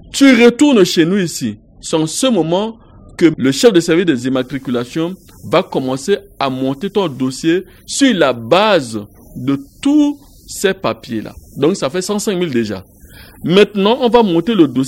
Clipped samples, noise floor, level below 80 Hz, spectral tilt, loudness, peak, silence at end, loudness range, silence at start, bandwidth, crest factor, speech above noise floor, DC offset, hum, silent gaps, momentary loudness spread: 0.1%; -39 dBFS; -46 dBFS; -5 dB/octave; -14 LUFS; 0 dBFS; 0 s; 4 LU; 0.05 s; 16.5 kHz; 14 dB; 25 dB; under 0.1%; none; none; 14 LU